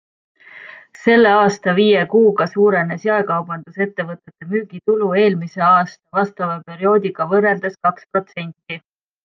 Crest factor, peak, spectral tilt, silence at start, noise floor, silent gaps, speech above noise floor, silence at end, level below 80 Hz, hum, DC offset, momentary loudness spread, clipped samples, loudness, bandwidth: 16 dB; -2 dBFS; -6.5 dB/octave; 0.55 s; -39 dBFS; none; 23 dB; 0.45 s; -66 dBFS; none; under 0.1%; 16 LU; under 0.1%; -16 LUFS; 7.4 kHz